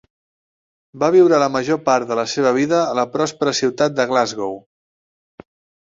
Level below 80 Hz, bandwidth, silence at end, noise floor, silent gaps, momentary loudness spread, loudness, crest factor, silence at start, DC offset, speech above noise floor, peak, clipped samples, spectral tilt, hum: -62 dBFS; 7.8 kHz; 1.35 s; under -90 dBFS; none; 8 LU; -17 LUFS; 16 dB; 0.95 s; under 0.1%; over 73 dB; -2 dBFS; under 0.1%; -4.5 dB/octave; none